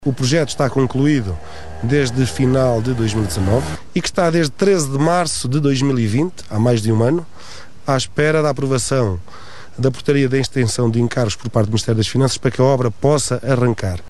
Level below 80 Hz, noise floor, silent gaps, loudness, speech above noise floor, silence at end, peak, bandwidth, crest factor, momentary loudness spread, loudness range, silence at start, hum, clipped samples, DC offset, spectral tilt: -40 dBFS; -39 dBFS; none; -17 LUFS; 22 dB; 0.1 s; 0 dBFS; 13 kHz; 16 dB; 6 LU; 2 LU; 0 s; none; under 0.1%; 3%; -5.5 dB/octave